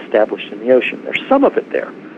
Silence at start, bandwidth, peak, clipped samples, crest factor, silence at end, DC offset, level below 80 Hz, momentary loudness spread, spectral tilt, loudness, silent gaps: 0 s; 7.4 kHz; 0 dBFS; under 0.1%; 16 dB; 0 s; under 0.1%; -60 dBFS; 9 LU; -6.5 dB/octave; -16 LUFS; none